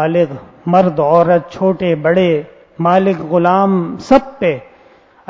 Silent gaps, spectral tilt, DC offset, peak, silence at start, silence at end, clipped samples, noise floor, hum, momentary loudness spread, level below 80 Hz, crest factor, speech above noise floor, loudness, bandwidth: none; -8 dB/octave; under 0.1%; 0 dBFS; 0 s; 0.7 s; 0.1%; -46 dBFS; none; 7 LU; -48 dBFS; 14 dB; 33 dB; -14 LUFS; 7.6 kHz